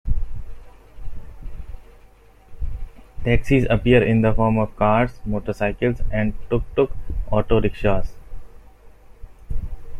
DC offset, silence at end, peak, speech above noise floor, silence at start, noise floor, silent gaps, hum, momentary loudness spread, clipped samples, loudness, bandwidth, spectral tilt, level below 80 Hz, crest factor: under 0.1%; 0 s; -4 dBFS; 30 dB; 0.05 s; -48 dBFS; none; none; 23 LU; under 0.1%; -21 LUFS; 6.6 kHz; -8.5 dB/octave; -30 dBFS; 18 dB